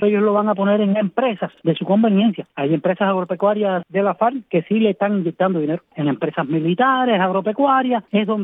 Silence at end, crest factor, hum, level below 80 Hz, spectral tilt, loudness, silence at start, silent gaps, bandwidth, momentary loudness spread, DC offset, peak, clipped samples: 0 s; 14 dB; none; -72 dBFS; -10.5 dB/octave; -19 LUFS; 0 s; none; 3.9 kHz; 6 LU; under 0.1%; -4 dBFS; under 0.1%